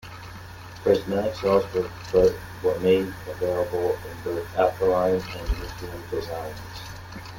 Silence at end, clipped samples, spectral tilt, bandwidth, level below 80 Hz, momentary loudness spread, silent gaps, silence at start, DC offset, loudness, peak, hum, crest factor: 0 s; under 0.1%; -6 dB/octave; 17 kHz; -40 dBFS; 17 LU; none; 0.05 s; under 0.1%; -25 LUFS; -6 dBFS; none; 20 dB